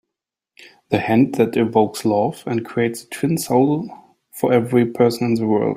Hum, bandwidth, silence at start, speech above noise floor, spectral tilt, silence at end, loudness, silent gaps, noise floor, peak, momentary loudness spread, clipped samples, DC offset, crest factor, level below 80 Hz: none; 16 kHz; 0.9 s; 66 dB; -6.5 dB/octave; 0 s; -19 LUFS; none; -84 dBFS; -2 dBFS; 8 LU; under 0.1%; under 0.1%; 16 dB; -58 dBFS